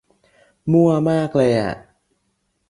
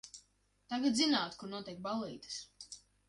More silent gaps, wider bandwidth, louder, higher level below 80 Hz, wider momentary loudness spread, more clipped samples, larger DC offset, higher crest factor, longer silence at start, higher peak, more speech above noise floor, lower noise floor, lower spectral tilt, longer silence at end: neither; about the same, 11 kHz vs 11.5 kHz; first, -18 LUFS vs -36 LUFS; first, -54 dBFS vs -74 dBFS; second, 14 LU vs 20 LU; neither; neither; about the same, 16 dB vs 18 dB; first, 0.65 s vs 0.05 s; first, -4 dBFS vs -20 dBFS; first, 53 dB vs 36 dB; about the same, -69 dBFS vs -72 dBFS; first, -8 dB/octave vs -3 dB/octave; first, 0.9 s vs 0.3 s